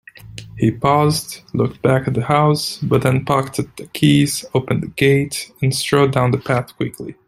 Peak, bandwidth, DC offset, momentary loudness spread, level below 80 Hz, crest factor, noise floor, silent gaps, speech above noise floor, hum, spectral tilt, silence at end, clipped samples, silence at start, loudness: -2 dBFS; 14.5 kHz; under 0.1%; 11 LU; -48 dBFS; 16 dB; -37 dBFS; none; 20 dB; none; -5.5 dB/octave; 0.15 s; under 0.1%; 0.25 s; -17 LUFS